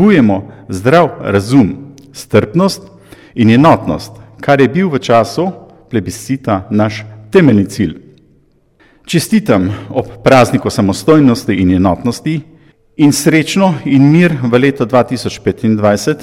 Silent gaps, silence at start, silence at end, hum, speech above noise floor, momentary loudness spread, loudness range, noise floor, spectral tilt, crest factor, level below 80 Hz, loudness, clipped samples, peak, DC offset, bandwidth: none; 0 s; 0 s; none; 40 dB; 11 LU; 3 LU; -51 dBFS; -6.5 dB/octave; 12 dB; -42 dBFS; -11 LUFS; 0.2%; 0 dBFS; under 0.1%; 16 kHz